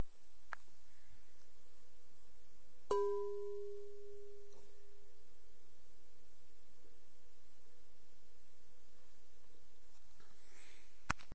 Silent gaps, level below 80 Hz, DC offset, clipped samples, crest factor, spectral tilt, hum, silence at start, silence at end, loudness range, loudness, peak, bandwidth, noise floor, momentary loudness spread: none; -68 dBFS; 1%; under 0.1%; 32 dB; -5 dB/octave; none; 0 s; 0.1 s; 21 LU; -45 LUFS; -16 dBFS; 8 kHz; -72 dBFS; 25 LU